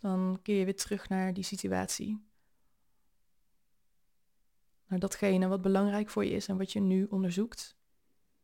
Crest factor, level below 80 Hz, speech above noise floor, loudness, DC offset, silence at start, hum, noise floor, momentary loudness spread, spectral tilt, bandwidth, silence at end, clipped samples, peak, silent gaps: 18 dB; -64 dBFS; 48 dB; -32 LUFS; under 0.1%; 0.05 s; none; -79 dBFS; 9 LU; -5.5 dB/octave; 16.5 kHz; 0.75 s; under 0.1%; -16 dBFS; none